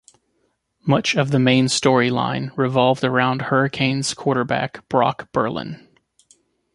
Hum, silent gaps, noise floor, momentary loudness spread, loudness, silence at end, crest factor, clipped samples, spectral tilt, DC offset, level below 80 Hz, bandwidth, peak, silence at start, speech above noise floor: none; none; -68 dBFS; 8 LU; -19 LUFS; 1 s; 20 dB; under 0.1%; -5 dB/octave; under 0.1%; -58 dBFS; 11.5 kHz; -2 dBFS; 0.85 s; 49 dB